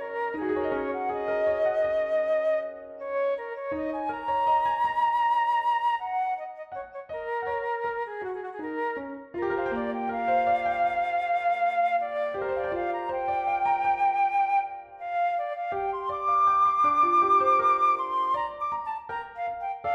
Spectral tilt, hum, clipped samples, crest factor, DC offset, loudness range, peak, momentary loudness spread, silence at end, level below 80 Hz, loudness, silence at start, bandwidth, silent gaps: -5.5 dB/octave; none; under 0.1%; 14 dB; under 0.1%; 7 LU; -12 dBFS; 12 LU; 0 s; -62 dBFS; -26 LUFS; 0 s; 8.8 kHz; none